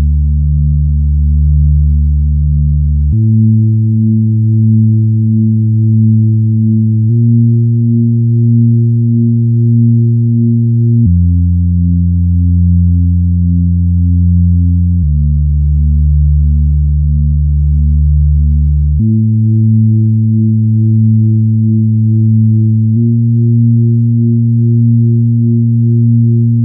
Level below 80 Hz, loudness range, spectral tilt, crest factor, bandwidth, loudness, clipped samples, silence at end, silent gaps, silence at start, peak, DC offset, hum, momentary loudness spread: -16 dBFS; 1 LU; -26 dB/octave; 8 dB; 0.6 kHz; -10 LUFS; under 0.1%; 0 s; none; 0 s; 0 dBFS; under 0.1%; none; 3 LU